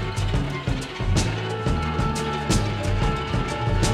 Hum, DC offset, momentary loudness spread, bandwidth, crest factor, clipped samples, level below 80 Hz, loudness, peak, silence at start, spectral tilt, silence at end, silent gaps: none; under 0.1%; 3 LU; 13.5 kHz; 16 dB; under 0.1%; -30 dBFS; -25 LUFS; -8 dBFS; 0 s; -5 dB/octave; 0 s; none